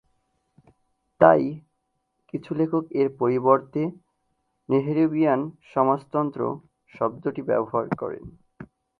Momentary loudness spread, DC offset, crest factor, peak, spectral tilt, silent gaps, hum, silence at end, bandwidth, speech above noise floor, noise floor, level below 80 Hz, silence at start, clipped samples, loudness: 12 LU; under 0.1%; 24 dB; 0 dBFS; -10 dB/octave; none; none; 0.35 s; 4.9 kHz; 52 dB; -75 dBFS; -64 dBFS; 1.2 s; under 0.1%; -24 LUFS